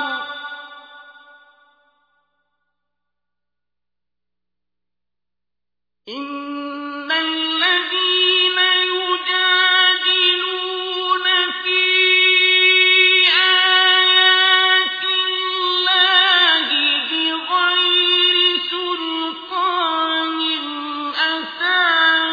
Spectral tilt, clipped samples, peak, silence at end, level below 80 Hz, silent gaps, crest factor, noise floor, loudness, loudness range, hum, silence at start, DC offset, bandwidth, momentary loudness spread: -1 dB/octave; under 0.1%; -2 dBFS; 0 s; -70 dBFS; none; 16 dB; -88 dBFS; -14 LUFS; 10 LU; 60 Hz at -90 dBFS; 0 s; under 0.1%; 5 kHz; 14 LU